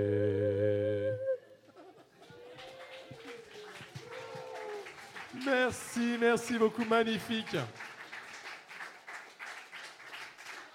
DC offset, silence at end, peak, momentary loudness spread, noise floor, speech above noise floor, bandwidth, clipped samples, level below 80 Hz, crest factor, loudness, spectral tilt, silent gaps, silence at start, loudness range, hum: under 0.1%; 0 s; -16 dBFS; 19 LU; -56 dBFS; 25 dB; 16 kHz; under 0.1%; -76 dBFS; 20 dB; -34 LUFS; -5 dB/octave; none; 0 s; 14 LU; none